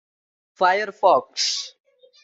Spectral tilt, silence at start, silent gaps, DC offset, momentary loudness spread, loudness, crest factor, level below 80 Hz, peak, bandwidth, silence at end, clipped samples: -1 dB/octave; 0.6 s; none; under 0.1%; 8 LU; -20 LUFS; 20 dB; -76 dBFS; -4 dBFS; 8.2 kHz; 0.55 s; under 0.1%